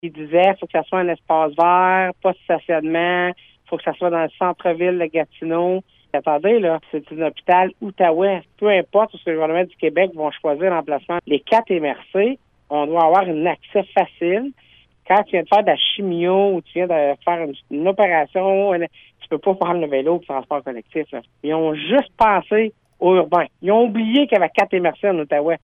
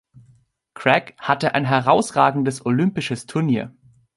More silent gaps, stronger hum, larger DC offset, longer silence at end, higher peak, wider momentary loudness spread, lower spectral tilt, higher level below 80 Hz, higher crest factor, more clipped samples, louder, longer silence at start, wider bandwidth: neither; neither; neither; second, 0.05 s vs 0.45 s; second, -4 dBFS vs 0 dBFS; about the same, 8 LU vs 8 LU; first, -7.5 dB/octave vs -6 dB/octave; about the same, -60 dBFS vs -60 dBFS; second, 14 dB vs 20 dB; neither; about the same, -19 LUFS vs -20 LUFS; second, 0.05 s vs 0.75 s; second, 6.2 kHz vs 11.5 kHz